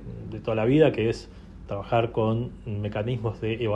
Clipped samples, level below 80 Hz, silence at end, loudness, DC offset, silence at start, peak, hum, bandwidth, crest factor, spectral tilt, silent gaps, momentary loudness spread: under 0.1%; -46 dBFS; 0 s; -26 LUFS; under 0.1%; 0 s; -8 dBFS; none; 9.2 kHz; 18 dB; -8 dB/octave; none; 16 LU